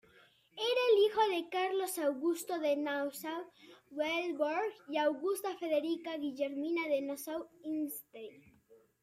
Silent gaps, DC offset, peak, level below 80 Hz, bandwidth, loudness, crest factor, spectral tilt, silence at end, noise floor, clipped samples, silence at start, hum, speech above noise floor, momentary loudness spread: none; under 0.1%; -18 dBFS; -82 dBFS; 16 kHz; -35 LUFS; 18 dB; -2.5 dB/octave; 0.25 s; -65 dBFS; under 0.1%; 0.55 s; none; 30 dB; 13 LU